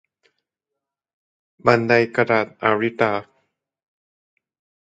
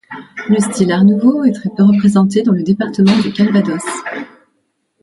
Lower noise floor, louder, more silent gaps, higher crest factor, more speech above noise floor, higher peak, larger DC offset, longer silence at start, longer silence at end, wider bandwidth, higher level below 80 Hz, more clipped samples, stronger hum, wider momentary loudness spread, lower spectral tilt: first, -84 dBFS vs -65 dBFS; second, -19 LUFS vs -13 LUFS; neither; first, 22 dB vs 12 dB; first, 66 dB vs 53 dB; about the same, 0 dBFS vs 0 dBFS; neither; first, 1.65 s vs 0.1 s; first, 1.6 s vs 0.8 s; second, 7.8 kHz vs 11.5 kHz; second, -62 dBFS vs -56 dBFS; neither; neither; second, 6 LU vs 14 LU; about the same, -7 dB/octave vs -6.5 dB/octave